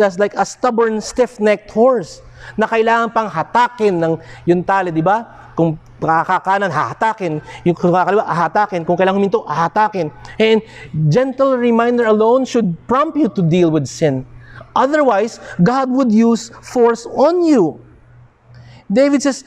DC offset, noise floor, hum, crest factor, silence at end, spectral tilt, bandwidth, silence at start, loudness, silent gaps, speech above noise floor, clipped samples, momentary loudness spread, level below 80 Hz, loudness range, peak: under 0.1%; -45 dBFS; none; 14 dB; 0.05 s; -6.5 dB/octave; 10.5 kHz; 0 s; -15 LUFS; none; 30 dB; under 0.1%; 7 LU; -50 dBFS; 2 LU; -2 dBFS